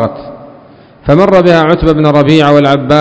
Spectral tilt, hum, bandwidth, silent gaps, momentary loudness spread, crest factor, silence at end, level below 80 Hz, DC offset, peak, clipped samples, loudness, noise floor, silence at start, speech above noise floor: -7.5 dB/octave; none; 8 kHz; none; 11 LU; 8 dB; 0 s; -30 dBFS; under 0.1%; 0 dBFS; 5%; -7 LUFS; -37 dBFS; 0 s; 30 dB